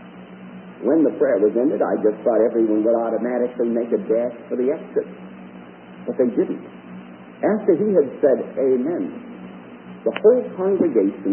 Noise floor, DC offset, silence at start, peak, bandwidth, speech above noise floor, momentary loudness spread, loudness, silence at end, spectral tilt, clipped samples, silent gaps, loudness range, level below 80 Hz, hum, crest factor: -40 dBFS; under 0.1%; 0 s; -4 dBFS; 3.3 kHz; 21 dB; 21 LU; -20 LUFS; 0 s; -12 dB/octave; under 0.1%; none; 5 LU; -68 dBFS; 60 Hz at -50 dBFS; 18 dB